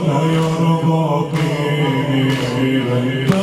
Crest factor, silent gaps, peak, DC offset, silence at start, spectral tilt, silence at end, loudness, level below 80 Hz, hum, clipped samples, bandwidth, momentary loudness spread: 14 dB; none; -2 dBFS; under 0.1%; 0 s; -7 dB/octave; 0 s; -17 LUFS; -50 dBFS; none; under 0.1%; 14 kHz; 2 LU